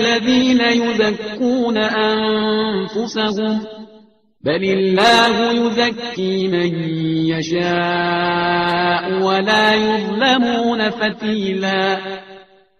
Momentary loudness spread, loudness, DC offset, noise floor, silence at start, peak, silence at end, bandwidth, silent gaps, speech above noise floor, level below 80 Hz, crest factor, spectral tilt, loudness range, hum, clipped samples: 7 LU; -16 LUFS; under 0.1%; -49 dBFS; 0 s; 0 dBFS; 0.35 s; 11.5 kHz; none; 32 dB; -54 dBFS; 16 dB; -5 dB/octave; 3 LU; none; under 0.1%